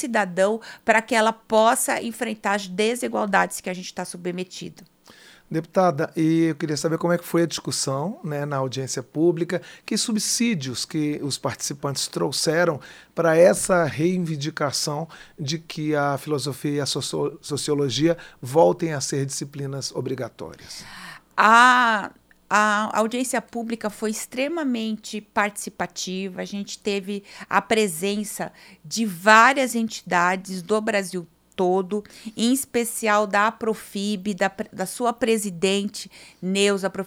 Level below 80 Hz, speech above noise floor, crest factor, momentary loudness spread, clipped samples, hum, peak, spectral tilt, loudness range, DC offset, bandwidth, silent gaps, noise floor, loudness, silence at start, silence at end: -62 dBFS; 27 dB; 24 dB; 12 LU; under 0.1%; none; 0 dBFS; -4 dB/octave; 6 LU; under 0.1%; 18 kHz; none; -50 dBFS; -23 LUFS; 0 s; 0 s